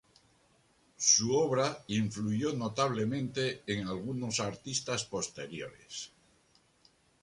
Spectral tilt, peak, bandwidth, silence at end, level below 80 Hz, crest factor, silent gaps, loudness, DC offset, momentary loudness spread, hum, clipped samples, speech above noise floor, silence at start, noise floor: -3.5 dB/octave; -12 dBFS; 11.5 kHz; 1.15 s; -66 dBFS; 22 dB; none; -32 LUFS; under 0.1%; 17 LU; none; under 0.1%; 35 dB; 1 s; -68 dBFS